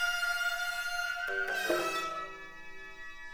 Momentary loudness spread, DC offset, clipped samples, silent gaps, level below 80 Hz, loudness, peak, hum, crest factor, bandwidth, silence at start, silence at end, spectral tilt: 16 LU; under 0.1%; under 0.1%; none; -60 dBFS; -33 LUFS; -18 dBFS; none; 18 dB; over 20 kHz; 0 s; 0 s; -1 dB/octave